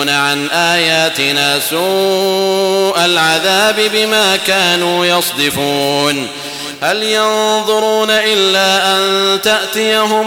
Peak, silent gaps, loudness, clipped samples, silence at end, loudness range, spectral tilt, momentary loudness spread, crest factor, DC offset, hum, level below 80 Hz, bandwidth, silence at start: -2 dBFS; none; -11 LUFS; under 0.1%; 0 s; 2 LU; -2.5 dB/octave; 4 LU; 12 dB; under 0.1%; none; -54 dBFS; 19 kHz; 0 s